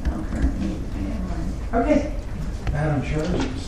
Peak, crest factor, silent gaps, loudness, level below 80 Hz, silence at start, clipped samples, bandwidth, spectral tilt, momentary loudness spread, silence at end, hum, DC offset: -6 dBFS; 18 dB; none; -25 LUFS; -28 dBFS; 0 s; under 0.1%; 11 kHz; -7 dB/octave; 9 LU; 0 s; none; under 0.1%